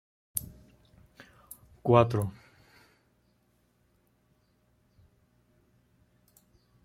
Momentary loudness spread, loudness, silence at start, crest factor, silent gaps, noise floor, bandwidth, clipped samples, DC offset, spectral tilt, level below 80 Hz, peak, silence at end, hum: 27 LU; -28 LUFS; 0.35 s; 30 dB; none; -70 dBFS; 16.5 kHz; under 0.1%; under 0.1%; -6.5 dB/octave; -62 dBFS; -6 dBFS; 4.55 s; 60 Hz at -60 dBFS